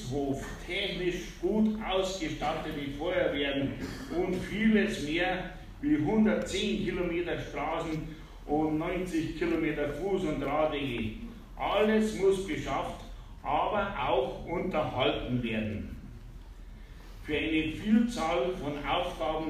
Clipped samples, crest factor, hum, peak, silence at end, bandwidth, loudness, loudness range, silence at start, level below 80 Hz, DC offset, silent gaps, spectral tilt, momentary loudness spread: under 0.1%; 16 dB; none; -14 dBFS; 0 s; 15 kHz; -31 LUFS; 3 LU; 0 s; -46 dBFS; under 0.1%; none; -5.5 dB/octave; 15 LU